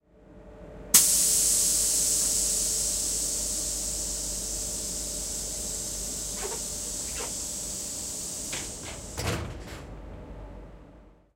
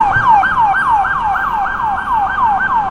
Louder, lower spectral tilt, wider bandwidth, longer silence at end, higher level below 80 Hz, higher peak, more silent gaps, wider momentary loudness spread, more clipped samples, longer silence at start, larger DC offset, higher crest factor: second, -26 LUFS vs -13 LUFS; second, -1 dB/octave vs -5 dB/octave; about the same, 16 kHz vs 15.5 kHz; first, 0.25 s vs 0 s; second, -44 dBFS vs -36 dBFS; about the same, -2 dBFS vs 0 dBFS; neither; first, 21 LU vs 6 LU; neither; first, 0.3 s vs 0 s; neither; first, 28 dB vs 12 dB